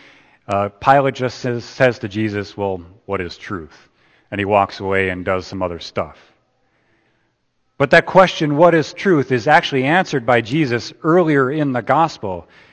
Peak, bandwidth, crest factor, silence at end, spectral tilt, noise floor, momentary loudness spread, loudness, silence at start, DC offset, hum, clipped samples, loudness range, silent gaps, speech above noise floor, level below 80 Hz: 0 dBFS; 8.8 kHz; 18 dB; 0.3 s; -6 dB/octave; -66 dBFS; 13 LU; -17 LUFS; 0.5 s; under 0.1%; none; under 0.1%; 8 LU; none; 49 dB; -52 dBFS